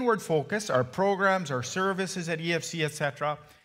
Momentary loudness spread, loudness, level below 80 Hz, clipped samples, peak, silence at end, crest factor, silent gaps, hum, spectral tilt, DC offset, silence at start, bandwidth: 6 LU; -28 LUFS; -68 dBFS; under 0.1%; -10 dBFS; 0.2 s; 18 dB; none; none; -4.5 dB/octave; under 0.1%; 0 s; 16 kHz